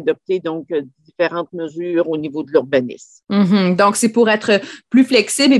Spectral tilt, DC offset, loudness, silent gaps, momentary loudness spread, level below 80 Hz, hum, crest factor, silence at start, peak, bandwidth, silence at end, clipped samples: -4.5 dB/octave; under 0.1%; -17 LUFS; none; 11 LU; -64 dBFS; none; 16 dB; 0 s; 0 dBFS; 12.5 kHz; 0 s; under 0.1%